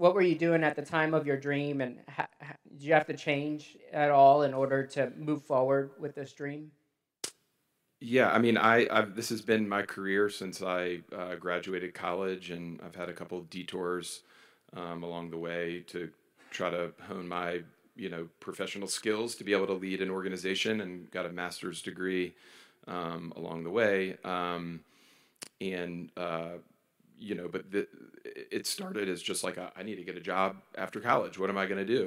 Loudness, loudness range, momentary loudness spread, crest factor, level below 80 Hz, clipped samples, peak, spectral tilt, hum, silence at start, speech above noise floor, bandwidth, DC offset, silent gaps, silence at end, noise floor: -32 LUFS; 11 LU; 15 LU; 24 dB; -78 dBFS; under 0.1%; -8 dBFS; -5 dB/octave; none; 0 s; 46 dB; 16 kHz; under 0.1%; none; 0 s; -78 dBFS